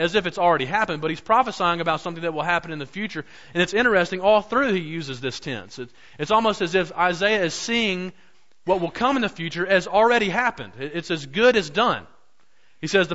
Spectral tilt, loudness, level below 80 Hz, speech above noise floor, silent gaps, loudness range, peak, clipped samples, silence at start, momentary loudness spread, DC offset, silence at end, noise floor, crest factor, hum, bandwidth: -4.5 dB/octave; -22 LUFS; -54 dBFS; 42 dB; none; 2 LU; -6 dBFS; under 0.1%; 0 s; 13 LU; 0.4%; 0 s; -64 dBFS; 16 dB; none; 8 kHz